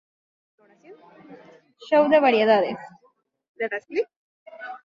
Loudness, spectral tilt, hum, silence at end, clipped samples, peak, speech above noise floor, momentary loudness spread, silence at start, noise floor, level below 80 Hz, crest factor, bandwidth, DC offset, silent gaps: -21 LUFS; -6 dB/octave; none; 0.1 s; under 0.1%; -6 dBFS; 44 dB; 20 LU; 0.9 s; -64 dBFS; -72 dBFS; 20 dB; 7.2 kHz; under 0.1%; 3.48-3.55 s, 4.16-4.46 s